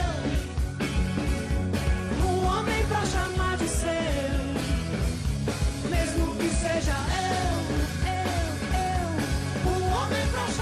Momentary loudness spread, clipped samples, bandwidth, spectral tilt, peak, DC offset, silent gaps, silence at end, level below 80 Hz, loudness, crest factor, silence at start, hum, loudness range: 3 LU; under 0.1%; 13.5 kHz; -5 dB/octave; -14 dBFS; under 0.1%; none; 0 s; -32 dBFS; -27 LUFS; 12 dB; 0 s; none; 1 LU